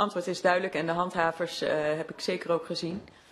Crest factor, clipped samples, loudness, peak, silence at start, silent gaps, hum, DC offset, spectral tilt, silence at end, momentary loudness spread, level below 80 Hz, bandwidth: 20 dB; under 0.1%; -29 LUFS; -10 dBFS; 0 s; none; none; under 0.1%; -4.5 dB/octave; 0.2 s; 8 LU; -66 dBFS; 13 kHz